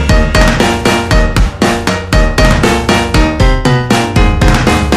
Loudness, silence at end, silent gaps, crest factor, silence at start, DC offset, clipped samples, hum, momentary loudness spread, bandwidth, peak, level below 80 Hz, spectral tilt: -10 LUFS; 0 s; none; 8 dB; 0 s; under 0.1%; 0.5%; none; 3 LU; 15 kHz; 0 dBFS; -14 dBFS; -5 dB/octave